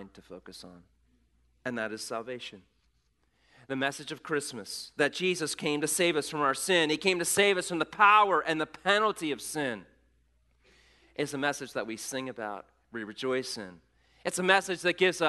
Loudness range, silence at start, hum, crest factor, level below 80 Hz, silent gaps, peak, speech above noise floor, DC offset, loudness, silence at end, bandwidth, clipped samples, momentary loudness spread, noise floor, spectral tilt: 12 LU; 0 s; none; 24 dB; -70 dBFS; none; -6 dBFS; 43 dB; under 0.1%; -28 LUFS; 0 s; 12 kHz; under 0.1%; 17 LU; -72 dBFS; -3 dB/octave